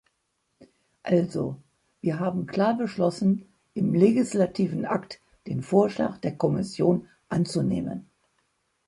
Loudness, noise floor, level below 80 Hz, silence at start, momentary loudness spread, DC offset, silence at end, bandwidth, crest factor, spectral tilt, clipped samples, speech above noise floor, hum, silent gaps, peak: -26 LUFS; -75 dBFS; -60 dBFS; 0.6 s; 12 LU; under 0.1%; 0.85 s; 11.5 kHz; 20 dB; -7.5 dB/octave; under 0.1%; 51 dB; none; none; -6 dBFS